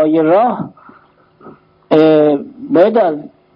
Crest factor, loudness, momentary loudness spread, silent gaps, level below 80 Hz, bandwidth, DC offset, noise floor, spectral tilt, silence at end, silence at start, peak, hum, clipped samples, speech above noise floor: 14 dB; -12 LUFS; 14 LU; none; -62 dBFS; 5.4 kHz; under 0.1%; -48 dBFS; -9.5 dB/octave; 0.3 s; 0 s; 0 dBFS; none; under 0.1%; 37 dB